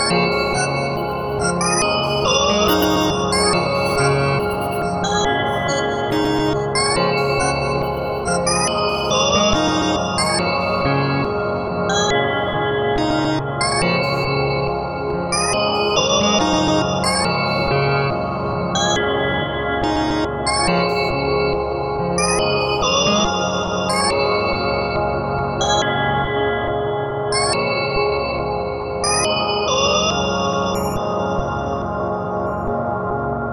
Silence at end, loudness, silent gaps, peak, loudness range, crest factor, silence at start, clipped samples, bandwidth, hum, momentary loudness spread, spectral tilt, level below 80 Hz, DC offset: 0 s; -18 LUFS; none; -2 dBFS; 2 LU; 16 dB; 0 s; under 0.1%; 18 kHz; none; 6 LU; -4 dB/octave; -36 dBFS; under 0.1%